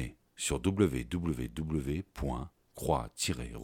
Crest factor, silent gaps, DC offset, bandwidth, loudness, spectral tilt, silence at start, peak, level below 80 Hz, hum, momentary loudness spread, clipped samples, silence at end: 20 dB; none; under 0.1%; 18 kHz; -34 LUFS; -5 dB/octave; 0 s; -14 dBFS; -46 dBFS; none; 10 LU; under 0.1%; 0 s